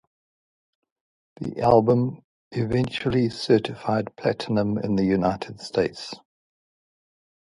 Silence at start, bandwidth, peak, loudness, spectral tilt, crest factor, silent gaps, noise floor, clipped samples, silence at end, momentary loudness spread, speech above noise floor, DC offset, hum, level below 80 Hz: 1.4 s; 11.5 kHz; -4 dBFS; -24 LUFS; -7 dB/octave; 22 dB; 2.24-2.51 s; under -90 dBFS; under 0.1%; 1.3 s; 15 LU; over 67 dB; under 0.1%; none; -52 dBFS